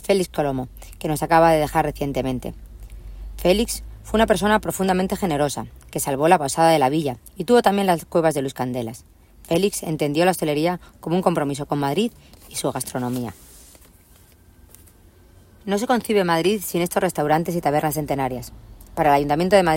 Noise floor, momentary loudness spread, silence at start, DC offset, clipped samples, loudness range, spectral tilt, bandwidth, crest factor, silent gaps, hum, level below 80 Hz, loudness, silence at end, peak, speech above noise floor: -51 dBFS; 14 LU; 0 s; under 0.1%; under 0.1%; 8 LU; -5 dB/octave; 16.5 kHz; 20 dB; none; none; -42 dBFS; -21 LUFS; 0 s; -2 dBFS; 31 dB